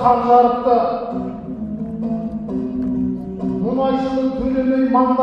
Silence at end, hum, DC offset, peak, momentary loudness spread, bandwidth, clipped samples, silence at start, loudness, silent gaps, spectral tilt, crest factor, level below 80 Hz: 0 s; none; under 0.1%; 0 dBFS; 13 LU; 6 kHz; under 0.1%; 0 s; -19 LUFS; none; -9 dB/octave; 18 dB; -42 dBFS